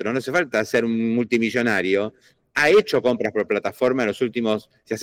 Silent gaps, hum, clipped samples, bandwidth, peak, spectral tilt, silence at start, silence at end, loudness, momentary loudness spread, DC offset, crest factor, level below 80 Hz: none; none; under 0.1%; 16.5 kHz; -8 dBFS; -5 dB/octave; 0 s; 0 s; -21 LUFS; 8 LU; under 0.1%; 12 dB; -62 dBFS